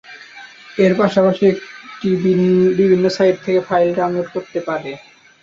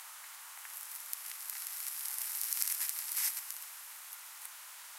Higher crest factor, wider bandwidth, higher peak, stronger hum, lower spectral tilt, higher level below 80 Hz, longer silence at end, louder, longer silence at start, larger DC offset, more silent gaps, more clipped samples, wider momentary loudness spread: second, 14 dB vs 34 dB; second, 7.6 kHz vs 17 kHz; first, -2 dBFS vs -8 dBFS; neither; first, -7.5 dB/octave vs 7.5 dB/octave; first, -58 dBFS vs under -90 dBFS; first, 0.45 s vs 0 s; first, -16 LUFS vs -37 LUFS; about the same, 0.1 s vs 0 s; neither; neither; neither; first, 21 LU vs 14 LU